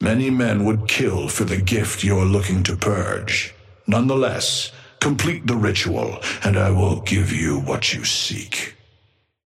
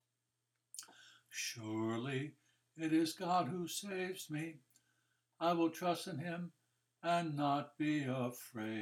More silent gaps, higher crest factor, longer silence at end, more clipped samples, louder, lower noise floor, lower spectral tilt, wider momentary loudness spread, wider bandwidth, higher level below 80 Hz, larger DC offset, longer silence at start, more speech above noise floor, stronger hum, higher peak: neither; about the same, 16 dB vs 18 dB; first, 0.75 s vs 0 s; neither; first, -20 LUFS vs -39 LUFS; second, -61 dBFS vs -87 dBFS; about the same, -4.5 dB/octave vs -5 dB/octave; second, 5 LU vs 13 LU; second, 15 kHz vs 17.5 kHz; first, -44 dBFS vs -88 dBFS; neither; second, 0 s vs 0.75 s; second, 42 dB vs 49 dB; neither; first, -4 dBFS vs -22 dBFS